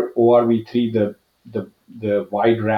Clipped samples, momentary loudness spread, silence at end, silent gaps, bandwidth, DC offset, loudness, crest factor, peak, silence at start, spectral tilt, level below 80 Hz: under 0.1%; 15 LU; 0 s; none; 5.4 kHz; under 0.1%; -19 LUFS; 16 dB; -4 dBFS; 0 s; -9 dB/octave; -62 dBFS